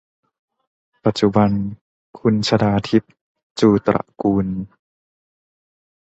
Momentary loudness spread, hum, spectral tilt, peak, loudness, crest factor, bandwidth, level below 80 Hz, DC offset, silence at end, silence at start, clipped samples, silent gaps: 12 LU; none; -7 dB/octave; -2 dBFS; -19 LUFS; 18 dB; 8.2 kHz; -48 dBFS; under 0.1%; 1.45 s; 1.05 s; under 0.1%; 1.81-2.13 s, 3.21-3.35 s, 3.43-3.56 s